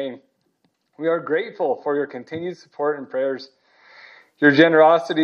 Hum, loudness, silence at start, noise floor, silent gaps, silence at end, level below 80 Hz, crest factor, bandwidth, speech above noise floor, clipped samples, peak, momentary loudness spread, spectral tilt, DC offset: none; -19 LUFS; 0 s; -68 dBFS; none; 0 s; -78 dBFS; 20 dB; 6.8 kHz; 49 dB; under 0.1%; 0 dBFS; 17 LU; -6.5 dB/octave; under 0.1%